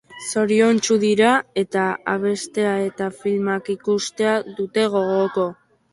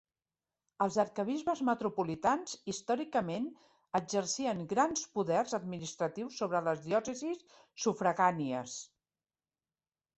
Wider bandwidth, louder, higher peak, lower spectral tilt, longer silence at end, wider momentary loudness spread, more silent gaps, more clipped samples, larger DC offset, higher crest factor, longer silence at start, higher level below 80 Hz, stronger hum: first, 11.5 kHz vs 8.4 kHz; first, -20 LUFS vs -34 LUFS; first, -4 dBFS vs -14 dBFS; about the same, -4.5 dB/octave vs -4.5 dB/octave; second, 0.4 s vs 1.3 s; about the same, 8 LU vs 9 LU; neither; neither; neither; about the same, 16 dB vs 20 dB; second, 0.1 s vs 0.8 s; first, -64 dBFS vs -74 dBFS; neither